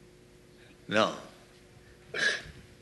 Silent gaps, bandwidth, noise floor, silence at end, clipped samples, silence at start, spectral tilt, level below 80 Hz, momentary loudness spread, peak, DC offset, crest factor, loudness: none; 12 kHz; -56 dBFS; 0.15 s; under 0.1%; 0.9 s; -3 dB/octave; -62 dBFS; 22 LU; -10 dBFS; under 0.1%; 24 dB; -30 LUFS